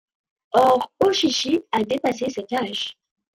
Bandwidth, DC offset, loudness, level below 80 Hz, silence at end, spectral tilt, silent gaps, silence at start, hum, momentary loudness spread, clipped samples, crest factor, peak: 16 kHz; under 0.1%; -21 LUFS; -64 dBFS; 0.45 s; -3.5 dB/octave; none; 0.55 s; none; 9 LU; under 0.1%; 18 dB; -4 dBFS